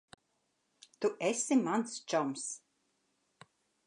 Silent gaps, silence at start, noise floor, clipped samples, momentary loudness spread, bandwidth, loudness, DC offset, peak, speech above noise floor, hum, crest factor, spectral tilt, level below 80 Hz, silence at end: none; 1 s; -79 dBFS; under 0.1%; 11 LU; 11 kHz; -34 LUFS; under 0.1%; -18 dBFS; 46 dB; none; 18 dB; -3.5 dB/octave; -88 dBFS; 1.3 s